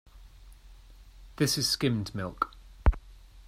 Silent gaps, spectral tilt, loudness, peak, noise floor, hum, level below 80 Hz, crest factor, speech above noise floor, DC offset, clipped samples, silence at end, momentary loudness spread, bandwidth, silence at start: none; -4 dB/octave; -30 LUFS; -10 dBFS; -52 dBFS; none; -38 dBFS; 22 dB; 22 dB; under 0.1%; under 0.1%; 0.05 s; 9 LU; 16 kHz; 0.15 s